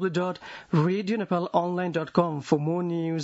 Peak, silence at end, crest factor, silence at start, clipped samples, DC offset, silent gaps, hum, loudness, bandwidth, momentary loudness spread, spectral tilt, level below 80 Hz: -6 dBFS; 0 s; 20 dB; 0 s; under 0.1%; under 0.1%; none; none; -27 LUFS; 8 kHz; 4 LU; -7.5 dB/octave; -66 dBFS